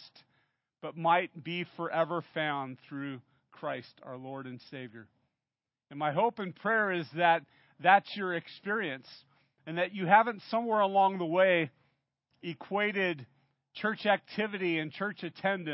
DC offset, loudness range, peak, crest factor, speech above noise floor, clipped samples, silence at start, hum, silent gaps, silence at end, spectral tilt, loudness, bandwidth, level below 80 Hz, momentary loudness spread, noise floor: under 0.1%; 9 LU; -8 dBFS; 24 dB; over 59 dB; under 0.1%; 0 s; none; none; 0 s; -3 dB/octave; -30 LUFS; 5.6 kHz; -86 dBFS; 19 LU; under -90 dBFS